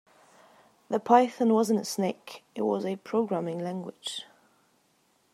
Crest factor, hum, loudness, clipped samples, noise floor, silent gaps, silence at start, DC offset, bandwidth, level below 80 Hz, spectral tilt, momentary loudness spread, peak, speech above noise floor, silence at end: 24 dB; none; -28 LUFS; under 0.1%; -68 dBFS; none; 0.9 s; under 0.1%; 15 kHz; -84 dBFS; -5.5 dB/octave; 14 LU; -6 dBFS; 41 dB; 1.1 s